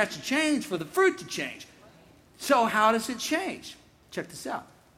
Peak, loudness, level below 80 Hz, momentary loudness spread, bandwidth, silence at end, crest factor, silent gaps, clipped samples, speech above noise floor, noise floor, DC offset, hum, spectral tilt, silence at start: -10 dBFS; -27 LUFS; -66 dBFS; 15 LU; 16.5 kHz; 0.35 s; 20 dB; none; under 0.1%; 28 dB; -56 dBFS; under 0.1%; none; -3 dB/octave; 0 s